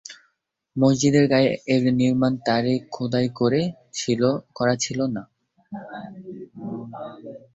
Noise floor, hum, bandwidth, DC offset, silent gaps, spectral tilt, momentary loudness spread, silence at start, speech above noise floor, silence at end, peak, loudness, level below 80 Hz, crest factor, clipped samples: -72 dBFS; none; 8 kHz; under 0.1%; none; -5.5 dB/octave; 19 LU; 0.1 s; 49 dB; 0.2 s; -6 dBFS; -22 LUFS; -58 dBFS; 18 dB; under 0.1%